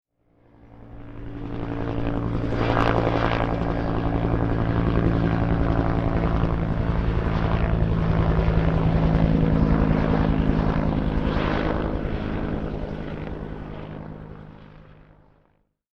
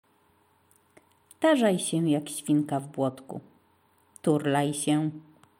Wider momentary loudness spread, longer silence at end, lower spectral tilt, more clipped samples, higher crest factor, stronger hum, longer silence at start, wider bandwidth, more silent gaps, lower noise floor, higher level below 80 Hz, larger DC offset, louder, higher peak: about the same, 15 LU vs 15 LU; first, 1.15 s vs 0.4 s; first, -9 dB/octave vs -5.5 dB/octave; neither; about the same, 18 dB vs 18 dB; neither; second, 0.65 s vs 1.4 s; second, 6.2 kHz vs 16.5 kHz; neither; about the same, -66 dBFS vs -65 dBFS; first, -28 dBFS vs -78 dBFS; neither; first, -24 LUFS vs -27 LUFS; first, -6 dBFS vs -10 dBFS